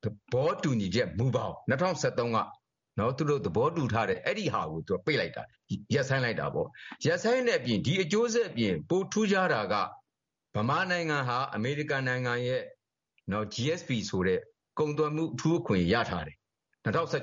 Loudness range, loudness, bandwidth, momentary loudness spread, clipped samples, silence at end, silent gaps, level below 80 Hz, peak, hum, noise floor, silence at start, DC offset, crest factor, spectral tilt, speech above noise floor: 3 LU; -30 LUFS; 7.6 kHz; 8 LU; under 0.1%; 0 s; none; -60 dBFS; -14 dBFS; none; -87 dBFS; 0.05 s; under 0.1%; 16 dB; -4.5 dB/octave; 58 dB